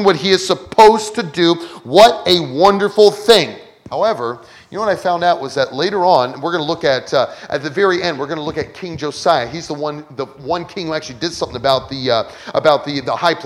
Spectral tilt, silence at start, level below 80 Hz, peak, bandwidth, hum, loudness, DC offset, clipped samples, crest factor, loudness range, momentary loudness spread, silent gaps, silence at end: -4.5 dB/octave; 0 s; -50 dBFS; 0 dBFS; 17.5 kHz; none; -15 LUFS; under 0.1%; 0.2%; 16 dB; 8 LU; 14 LU; none; 0 s